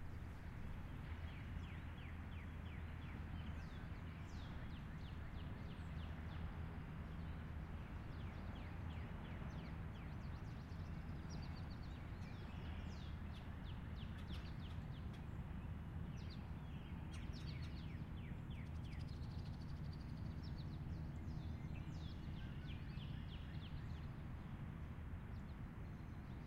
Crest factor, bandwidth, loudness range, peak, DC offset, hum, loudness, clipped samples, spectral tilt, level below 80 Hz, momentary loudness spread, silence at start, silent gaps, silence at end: 14 dB; 13.5 kHz; 2 LU; -36 dBFS; under 0.1%; none; -51 LUFS; under 0.1%; -7.5 dB/octave; -54 dBFS; 2 LU; 0 s; none; 0 s